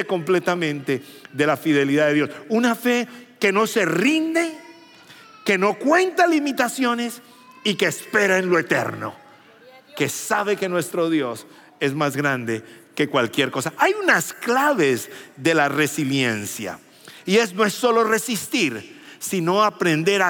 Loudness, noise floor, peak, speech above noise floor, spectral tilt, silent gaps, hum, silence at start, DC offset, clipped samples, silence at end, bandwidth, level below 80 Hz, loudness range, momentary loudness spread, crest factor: -21 LUFS; -48 dBFS; -2 dBFS; 28 dB; -4 dB/octave; none; none; 0 s; under 0.1%; under 0.1%; 0 s; 17.5 kHz; -80 dBFS; 3 LU; 12 LU; 20 dB